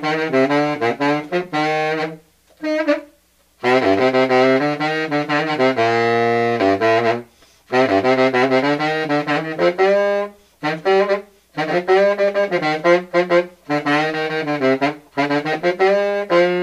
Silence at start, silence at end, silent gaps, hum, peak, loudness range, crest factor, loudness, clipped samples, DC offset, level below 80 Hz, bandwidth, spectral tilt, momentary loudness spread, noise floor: 0 s; 0 s; none; none; -2 dBFS; 3 LU; 16 dB; -18 LUFS; under 0.1%; under 0.1%; -62 dBFS; 12 kHz; -6 dB/octave; 7 LU; -57 dBFS